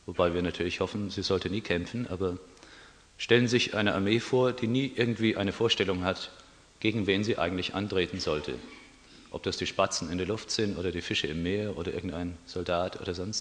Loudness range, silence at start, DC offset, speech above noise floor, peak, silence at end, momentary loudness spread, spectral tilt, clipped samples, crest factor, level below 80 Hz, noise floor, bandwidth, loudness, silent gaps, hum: 5 LU; 0.05 s; under 0.1%; 24 dB; -8 dBFS; 0 s; 10 LU; -5 dB/octave; under 0.1%; 22 dB; -56 dBFS; -54 dBFS; 10 kHz; -29 LUFS; none; none